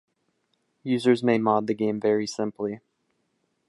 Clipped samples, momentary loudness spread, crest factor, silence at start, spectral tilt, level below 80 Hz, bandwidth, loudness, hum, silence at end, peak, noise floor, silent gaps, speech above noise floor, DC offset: under 0.1%; 11 LU; 18 dB; 0.85 s; -6 dB/octave; -72 dBFS; 11.5 kHz; -25 LUFS; none; 0.9 s; -8 dBFS; -73 dBFS; none; 50 dB; under 0.1%